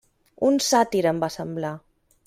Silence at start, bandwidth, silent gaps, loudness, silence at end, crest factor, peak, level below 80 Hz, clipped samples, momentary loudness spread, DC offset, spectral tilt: 0.4 s; 16 kHz; none; -23 LUFS; 0.5 s; 18 dB; -6 dBFS; -62 dBFS; under 0.1%; 12 LU; under 0.1%; -4 dB/octave